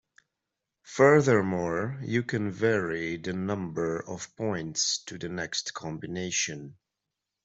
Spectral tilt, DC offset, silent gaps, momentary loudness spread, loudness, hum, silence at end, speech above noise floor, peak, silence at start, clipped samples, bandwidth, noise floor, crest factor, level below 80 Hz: -4 dB/octave; under 0.1%; none; 14 LU; -28 LUFS; none; 0.7 s; 58 dB; -6 dBFS; 0.85 s; under 0.1%; 8.2 kHz; -86 dBFS; 22 dB; -64 dBFS